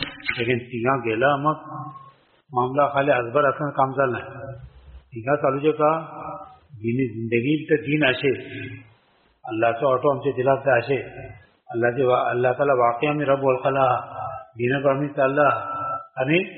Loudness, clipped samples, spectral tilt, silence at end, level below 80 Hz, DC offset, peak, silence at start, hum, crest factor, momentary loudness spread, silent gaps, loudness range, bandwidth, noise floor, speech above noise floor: -22 LUFS; under 0.1%; -4.5 dB/octave; 0 s; -56 dBFS; under 0.1%; -4 dBFS; 0 s; none; 18 dB; 16 LU; none; 3 LU; 4.3 kHz; -61 dBFS; 39 dB